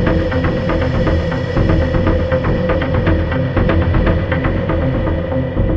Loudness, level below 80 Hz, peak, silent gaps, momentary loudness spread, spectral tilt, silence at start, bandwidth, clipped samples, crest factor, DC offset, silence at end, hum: -16 LUFS; -22 dBFS; 0 dBFS; none; 3 LU; -9 dB/octave; 0 s; 6.6 kHz; under 0.1%; 14 dB; under 0.1%; 0 s; none